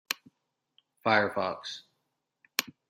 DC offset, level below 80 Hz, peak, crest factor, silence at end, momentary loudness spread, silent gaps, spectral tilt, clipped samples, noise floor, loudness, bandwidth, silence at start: under 0.1%; -80 dBFS; -4 dBFS; 30 dB; 0.2 s; 14 LU; none; -3 dB/octave; under 0.1%; -81 dBFS; -30 LUFS; 16 kHz; 0.1 s